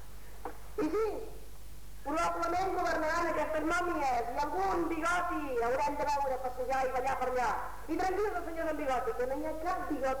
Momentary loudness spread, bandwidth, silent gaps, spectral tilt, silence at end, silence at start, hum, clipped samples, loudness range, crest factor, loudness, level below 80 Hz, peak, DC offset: 13 LU; over 20 kHz; none; -4.5 dB/octave; 0 s; 0 s; none; under 0.1%; 2 LU; 12 dB; -33 LUFS; -50 dBFS; -22 dBFS; 0.9%